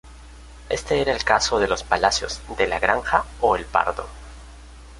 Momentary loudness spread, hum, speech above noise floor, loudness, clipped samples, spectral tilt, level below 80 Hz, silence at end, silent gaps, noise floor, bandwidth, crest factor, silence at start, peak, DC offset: 12 LU; none; 21 dB; -21 LUFS; under 0.1%; -3 dB/octave; -40 dBFS; 0 s; none; -42 dBFS; 11.5 kHz; 22 dB; 0.05 s; -2 dBFS; under 0.1%